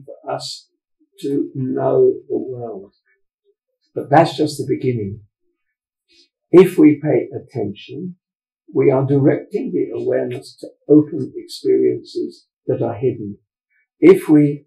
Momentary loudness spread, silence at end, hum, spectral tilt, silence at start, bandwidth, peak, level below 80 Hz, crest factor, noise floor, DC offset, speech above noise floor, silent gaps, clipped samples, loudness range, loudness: 19 LU; 0.1 s; none; -7.5 dB/octave; 0.1 s; 13.5 kHz; 0 dBFS; -62 dBFS; 18 dB; -78 dBFS; under 0.1%; 61 dB; 3.34-3.38 s, 12.53-12.57 s; under 0.1%; 5 LU; -17 LUFS